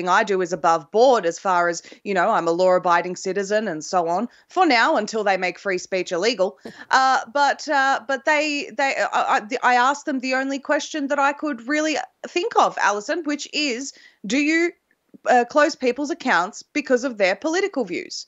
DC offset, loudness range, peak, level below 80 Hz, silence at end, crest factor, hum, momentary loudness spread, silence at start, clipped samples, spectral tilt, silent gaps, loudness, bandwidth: under 0.1%; 2 LU; -4 dBFS; -76 dBFS; 0.05 s; 18 dB; none; 8 LU; 0 s; under 0.1%; -3 dB/octave; none; -21 LUFS; 8.2 kHz